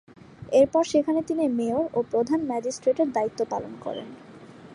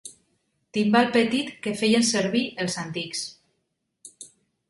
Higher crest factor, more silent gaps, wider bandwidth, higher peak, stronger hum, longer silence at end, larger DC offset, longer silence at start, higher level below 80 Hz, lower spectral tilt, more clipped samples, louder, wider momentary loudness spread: about the same, 18 dB vs 20 dB; neither; about the same, 11 kHz vs 11.5 kHz; about the same, -8 dBFS vs -6 dBFS; neither; second, 0 s vs 0.45 s; neither; first, 0.4 s vs 0.05 s; about the same, -62 dBFS vs -66 dBFS; first, -5.5 dB/octave vs -3.5 dB/octave; neither; about the same, -25 LUFS vs -24 LUFS; second, 14 LU vs 23 LU